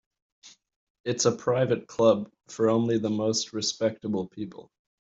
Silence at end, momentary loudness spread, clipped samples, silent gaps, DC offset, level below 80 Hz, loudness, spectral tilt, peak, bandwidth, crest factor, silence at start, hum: 0.5 s; 14 LU; under 0.1%; 0.76-1.04 s; under 0.1%; -66 dBFS; -26 LUFS; -4.5 dB/octave; -8 dBFS; 8 kHz; 20 dB; 0.45 s; none